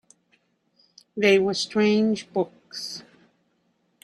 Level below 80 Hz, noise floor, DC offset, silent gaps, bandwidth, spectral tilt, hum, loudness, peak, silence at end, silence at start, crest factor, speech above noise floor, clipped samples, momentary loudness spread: -70 dBFS; -69 dBFS; under 0.1%; none; 12 kHz; -4.5 dB/octave; none; -23 LUFS; -6 dBFS; 1.05 s; 1.15 s; 20 dB; 47 dB; under 0.1%; 16 LU